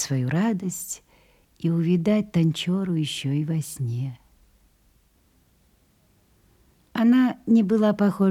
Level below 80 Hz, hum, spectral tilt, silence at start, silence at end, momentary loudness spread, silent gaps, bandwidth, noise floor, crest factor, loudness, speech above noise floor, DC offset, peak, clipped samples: -62 dBFS; none; -6.5 dB/octave; 0 s; 0 s; 12 LU; none; 15.5 kHz; -62 dBFS; 16 dB; -23 LUFS; 40 dB; under 0.1%; -8 dBFS; under 0.1%